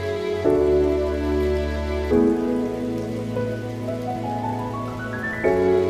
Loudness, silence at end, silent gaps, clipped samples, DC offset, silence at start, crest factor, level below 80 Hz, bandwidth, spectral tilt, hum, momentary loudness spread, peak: -23 LUFS; 0 s; none; under 0.1%; under 0.1%; 0 s; 16 dB; -34 dBFS; 14.5 kHz; -7.5 dB/octave; none; 9 LU; -6 dBFS